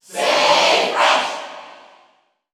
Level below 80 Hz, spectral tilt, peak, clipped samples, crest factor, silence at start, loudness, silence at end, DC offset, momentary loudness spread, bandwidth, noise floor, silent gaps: -78 dBFS; -0.5 dB/octave; -2 dBFS; under 0.1%; 16 dB; 0.1 s; -15 LUFS; 0.8 s; under 0.1%; 19 LU; over 20 kHz; -59 dBFS; none